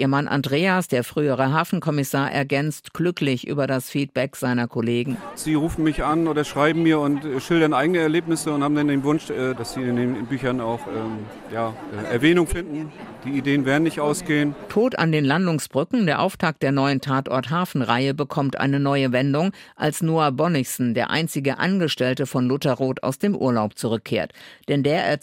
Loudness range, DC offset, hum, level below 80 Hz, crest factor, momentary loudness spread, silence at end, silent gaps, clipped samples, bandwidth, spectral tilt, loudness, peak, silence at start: 3 LU; under 0.1%; none; -48 dBFS; 18 dB; 7 LU; 0.05 s; none; under 0.1%; 16 kHz; -6 dB/octave; -22 LUFS; -4 dBFS; 0 s